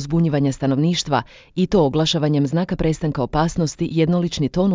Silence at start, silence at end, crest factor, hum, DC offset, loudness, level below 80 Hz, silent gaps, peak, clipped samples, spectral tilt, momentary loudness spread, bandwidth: 0 s; 0 s; 14 dB; none; under 0.1%; -20 LUFS; -40 dBFS; none; -4 dBFS; under 0.1%; -6.5 dB/octave; 5 LU; 7.6 kHz